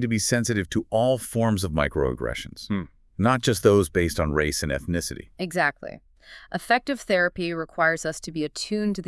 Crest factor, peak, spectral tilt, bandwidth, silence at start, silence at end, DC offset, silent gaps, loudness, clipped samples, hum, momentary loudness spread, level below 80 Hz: 20 dB; -4 dBFS; -5 dB/octave; 12 kHz; 0 s; 0.05 s; under 0.1%; none; -24 LUFS; under 0.1%; none; 10 LU; -44 dBFS